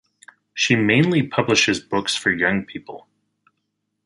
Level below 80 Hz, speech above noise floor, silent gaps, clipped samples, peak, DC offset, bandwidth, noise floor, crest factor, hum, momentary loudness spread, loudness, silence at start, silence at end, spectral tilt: -56 dBFS; 56 dB; none; under 0.1%; -2 dBFS; under 0.1%; 11.5 kHz; -75 dBFS; 20 dB; none; 19 LU; -19 LUFS; 0.55 s; 1.05 s; -4 dB/octave